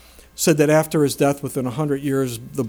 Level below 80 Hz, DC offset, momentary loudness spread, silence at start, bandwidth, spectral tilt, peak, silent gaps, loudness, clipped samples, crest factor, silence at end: -52 dBFS; under 0.1%; 8 LU; 0.4 s; over 20 kHz; -5.5 dB/octave; -4 dBFS; none; -20 LUFS; under 0.1%; 16 dB; 0 s